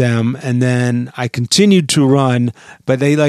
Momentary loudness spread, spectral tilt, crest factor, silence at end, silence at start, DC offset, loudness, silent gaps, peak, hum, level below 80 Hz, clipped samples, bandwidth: 10 LU; -5.5 dB/octave; 14 dB; 0 s; 0 s; under 0.1%; -14 LUFS; none; 0 dBFS; none; -56 dBFS; under 0.1%; 14 kHz